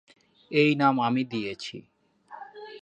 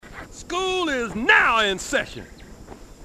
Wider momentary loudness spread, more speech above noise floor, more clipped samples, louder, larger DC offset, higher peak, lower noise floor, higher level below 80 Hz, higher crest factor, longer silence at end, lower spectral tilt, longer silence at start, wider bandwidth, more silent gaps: about the same, 23 LU vs 23 LU; about the same, 23 dB vs 21 dB; neither; second, -25 LUFS vs -20 LUFS; neither; second, -8 dBFS vs -4 dBFS; first, -48 dBFS vs -42 dBFS; second, -72 dBFS vs -46 dBFS; about the same, 20 dB vs 20 dB; about the same, 0.05 s vs 0 s; first, -6.5 dB/octave vs -2.5 dB/octave; first, 0.5 s vs 0.05 s; second, 8.8 kHz vs 14.5 kHz; neither